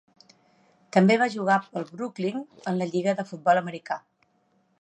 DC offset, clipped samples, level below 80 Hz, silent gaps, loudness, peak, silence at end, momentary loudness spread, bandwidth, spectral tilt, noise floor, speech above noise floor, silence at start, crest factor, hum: under 0.1%; under 0.1%; -80 dBFS; none; -26 LUFS; -6 dBFS; 0.85 s; 14 LU; 8.8 kHz; -6.5 dB/octave; -68 dBFS; 43 dB; 0.95 s; 22 dB; none